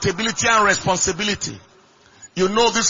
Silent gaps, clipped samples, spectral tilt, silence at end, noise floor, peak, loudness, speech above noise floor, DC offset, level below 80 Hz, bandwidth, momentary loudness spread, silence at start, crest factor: none; under 0.1%; -2.5 dB/octave; 0 s; -52 dBFS; -2 dBFS; -18 LUFS; 33 dB; under 0.1%; -48 dBFS; 7.6 kHz; 11 LU; 0 s; 18 dB